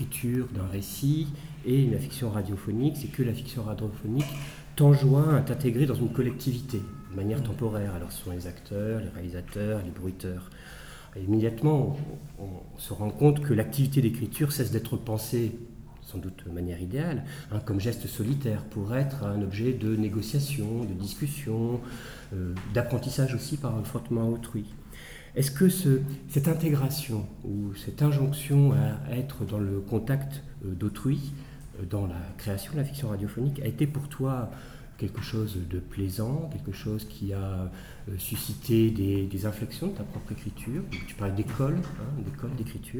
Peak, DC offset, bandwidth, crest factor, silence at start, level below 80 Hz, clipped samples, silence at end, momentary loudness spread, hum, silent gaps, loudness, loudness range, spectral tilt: -8 dBFS; under 0.1%; over 20 kHz; 20 dB; 0 s; -48 dBFS; under 0.1%; 0 s; 13 LU; none; none; -29 LUFS; 7 LU; -7 dB/octave